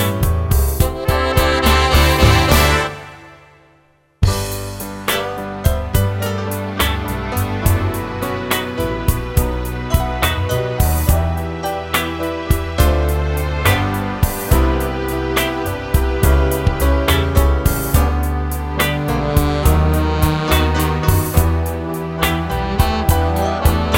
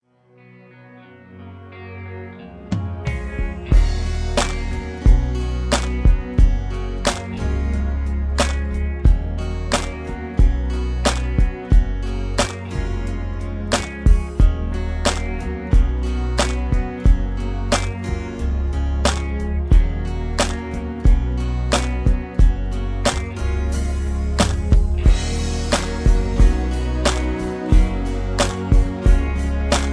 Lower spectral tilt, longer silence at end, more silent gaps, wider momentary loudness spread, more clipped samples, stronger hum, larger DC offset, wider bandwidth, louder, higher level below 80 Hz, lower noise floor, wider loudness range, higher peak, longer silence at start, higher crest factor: about the same, -5 dB/octave vs -5.5 dB/octave; about the same, 0 s vs 0 s; neither; about the same, 8 LU vs 8 LU; neither; neither; neither; first, 17 kHz vs 11 kHz; first, -17 LUFS vs -21 LUFS; about the same, -20 dBFS vs -20 dBFS; about the same, -54 dBFS vs -51 dBFS; first, 5 LU vs 2 LU; about the same, 0 dBFS vs -2 dBFS; second, 0 s vs 0.9 s; about the same, 16 dB vs 16 dB